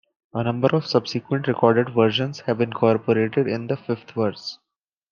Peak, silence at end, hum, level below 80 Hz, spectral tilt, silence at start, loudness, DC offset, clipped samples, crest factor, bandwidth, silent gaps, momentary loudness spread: -2 dBFS; 0.55 s; none; -66 dBFS; -7 dB/octave; 0.35 s; -22 LUFS; under 0.1%; under 0.1%; 20 dB; 7.2 kHz; none; 8 LU